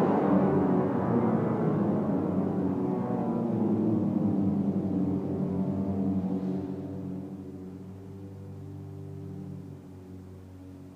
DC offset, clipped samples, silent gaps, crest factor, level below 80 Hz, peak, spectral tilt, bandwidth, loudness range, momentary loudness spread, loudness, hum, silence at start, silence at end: under 0.1%; under 0.1%; none; 16 dB; -66 dBFS; -14 dBFS; -10.5 dB/octave; 4.9 kHz; 14 LU; 18 LU; -28 LUFS; none; 0 s; 0 s